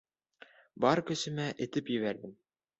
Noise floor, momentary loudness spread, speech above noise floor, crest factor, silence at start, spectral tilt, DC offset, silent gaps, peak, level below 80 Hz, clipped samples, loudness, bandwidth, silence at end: -60 dBFS; 10 LU; 28 dB; 22 dB; 0.75 s; -5 dB/octave; under 0.1%; none; -12 dBFS; -72 dBFS; under 0.1%; -33 LUFS; 8.2 kHz; 0.45 s